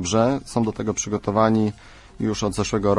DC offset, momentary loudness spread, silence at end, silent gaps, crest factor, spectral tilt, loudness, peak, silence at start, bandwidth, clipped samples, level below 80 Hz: under 0.1%; 7 LU; 0 s; none; 16 dB; -5.5 dB/octave; -22 LUFS; -6 dBFS; 0 s; 11.5 kHz; under 0.1%; -44 dBFS